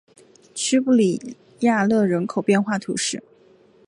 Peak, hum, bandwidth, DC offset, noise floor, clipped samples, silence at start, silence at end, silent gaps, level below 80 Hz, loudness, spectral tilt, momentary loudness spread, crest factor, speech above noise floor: -6 dBFS; none; 11.5 kHz; under 0.1%; -54 dBFS; under 0.1%; 0.55 s; 0.7 s; none; -66 dBFS; -21 LUFS; -4.5 dB/octave; 13 LU; 16 dB; 34 dB